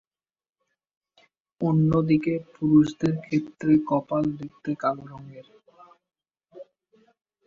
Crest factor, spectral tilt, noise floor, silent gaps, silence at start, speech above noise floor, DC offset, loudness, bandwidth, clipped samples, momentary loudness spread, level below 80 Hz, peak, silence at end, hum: 18 dB; -9 dB/octave; -64 dBFS; none; 1.6 s; 40 dB; under 0.1%; -24 LUFS; 7.4 kHz; under 0.1%; 15 LU; -58 dBFS; -8 dBFS; 0.85 s; none